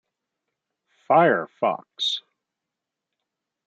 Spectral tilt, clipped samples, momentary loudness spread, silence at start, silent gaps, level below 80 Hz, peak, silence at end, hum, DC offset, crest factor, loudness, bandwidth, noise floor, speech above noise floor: -4.5 dB/octave; under 0.1%; 8 LU; 1.1 s; none; -82 dBFS; -6 dBFS; 1.45 s; none; under 0.1%; 22 dB; -22 LUFS; 8.8 kHz; -85 dBFS; 64 dB